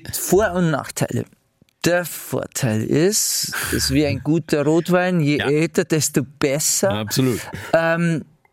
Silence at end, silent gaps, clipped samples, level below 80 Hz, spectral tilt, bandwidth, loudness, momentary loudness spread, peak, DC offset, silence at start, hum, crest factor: 0.3 s; none; under 0.1%; -46 dBFS; -4.5 dB/octave; 17 kHz; -19 LUFS; 7 LU; -4 dBFS; under 0.1%; 0.05 s; none; 16 dB